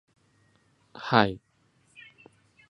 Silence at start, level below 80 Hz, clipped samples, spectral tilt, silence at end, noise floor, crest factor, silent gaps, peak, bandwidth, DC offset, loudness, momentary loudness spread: 0.95 s; -62 dBFS; under 0.1%; -7 dB/octave; 1.35 s; -66 dBFS; 28 dB; none; -2 dBFS; 10.5 kHz; under 0.1%; -25 LUFS; 27 LU